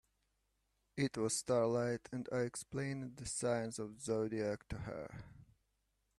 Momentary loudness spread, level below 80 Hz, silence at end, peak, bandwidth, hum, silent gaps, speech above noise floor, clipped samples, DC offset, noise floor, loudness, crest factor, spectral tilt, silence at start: 13 LU; -66 dBFS; 0.75 s; -24 dBFS; 13 kHz; none; none; 43 dB; under 0.1%; under 0.1%; -82 dBFS; -39 LUFS; 18 dB; -5 dB/octave; 0.95 s